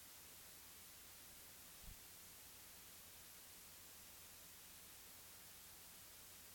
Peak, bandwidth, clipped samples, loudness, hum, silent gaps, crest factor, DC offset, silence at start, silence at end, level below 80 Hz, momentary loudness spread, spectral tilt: -44 dBFS; 18 kHz; under 0.1%; -57 LUFS; none; none; 16 dB; under 0.1%; 0 s; 0 s; -74 dBFS; 0 LU; -1 dB/octave